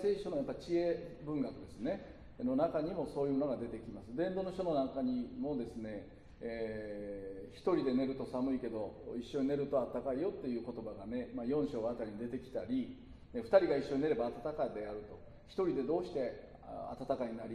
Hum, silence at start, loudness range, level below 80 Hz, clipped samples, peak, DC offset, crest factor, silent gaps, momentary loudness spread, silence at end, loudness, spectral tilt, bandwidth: none; 0 s; 4 LU; -60 dBFS; under 0.1%; -16 dBFS; under 0.1%; 22 dB; none; 12 LU; 0 s; -38 LUFS; -7.5 dB/octave; 10.5 kHz